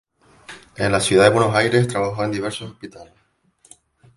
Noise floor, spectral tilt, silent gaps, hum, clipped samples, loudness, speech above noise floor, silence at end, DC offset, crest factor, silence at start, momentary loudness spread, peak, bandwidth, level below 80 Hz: -59 dBFS; -5 dB/octave; none; none; under 0.1%; -18 LUFS; 40 dB; 1.15 s; under 0.1%; 20 dB; 0.5 s; 25 LU; -2 dBFS; 11.5 kHz; -50 dBFS